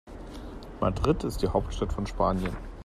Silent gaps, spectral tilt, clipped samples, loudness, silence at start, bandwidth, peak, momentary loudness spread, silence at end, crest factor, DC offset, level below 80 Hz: none; -7 dB/octave; under 0.1%; -29 LUFS; 0.05 s; 14.5 kHz; -10 dBFS; 15 LU; 0 s; 20 dB; under 0.1%; -36 dBFS